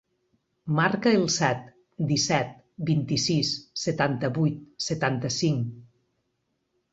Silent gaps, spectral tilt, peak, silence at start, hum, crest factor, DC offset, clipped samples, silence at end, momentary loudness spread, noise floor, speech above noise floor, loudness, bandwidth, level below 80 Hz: none; -4.5 dB/octave; -6 dBFS; 0.65 s; none; 20 dB; under 0.1%; under 0.1%; 1.1 s; 10 LU; -76 dBFS; 51 dB; -26 LUFS; 8 kHz; -60 dBFS